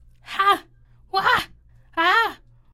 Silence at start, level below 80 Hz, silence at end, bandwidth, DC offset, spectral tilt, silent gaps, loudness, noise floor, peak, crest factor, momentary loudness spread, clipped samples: 0.25 s; -54 dBFS; 0.4 s; 16 kHz; under 0.1%; -2.5 dB/octave; none; -21 LUFS; -52 dBFS; -6 dBFS; 18 dB; 14 LU; under 0.1%